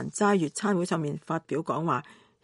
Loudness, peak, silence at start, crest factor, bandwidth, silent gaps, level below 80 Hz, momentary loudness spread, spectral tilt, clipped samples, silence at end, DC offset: -28 LUFS; -14 dBFS; 0 s; 16 dB; 11.5 kHz; none; -72 dBFS; 7 LU; -5.5 dB/octave; under 0.1%; 0.3 s; under 0.1%